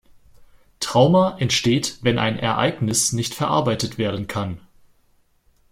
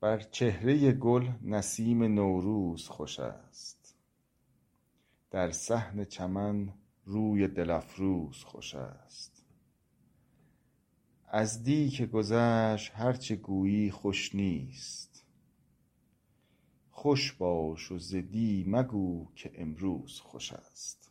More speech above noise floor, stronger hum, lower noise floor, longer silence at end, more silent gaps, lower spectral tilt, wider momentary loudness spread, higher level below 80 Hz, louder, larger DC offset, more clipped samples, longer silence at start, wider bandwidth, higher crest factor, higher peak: about the same, 40 dB vs 43 dB; neither; second, -60 dBFS vs -74 dBFS; first, 1.15 s vs 0.2 s; neither; second, -4.5 dB/octave vs -6 dB/octave; second, 11 LU vs 15 LU; first, -52 dBFS vs -60 dBFS; first, -20 LUFS vs -32 LUFS; neither; neither; first, 0.4 s vs 0 s; first, 16.5 kHz vs 12.5 kHz; about the same, 18 dB vs 20 dB; first, -4 dBFS vs -12 dBFS